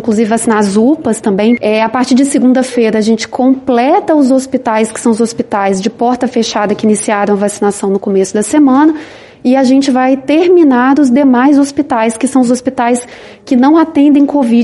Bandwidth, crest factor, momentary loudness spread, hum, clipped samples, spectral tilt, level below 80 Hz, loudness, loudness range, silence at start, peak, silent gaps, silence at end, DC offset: 11.5 kHz; 10 dB; 6 LU; none; under 0.1%; -5 dB/octave; -52 dBFS; -10 LUFS; 3 LU; 0 s; 0 dBFS; none; 0 s; under 0.1%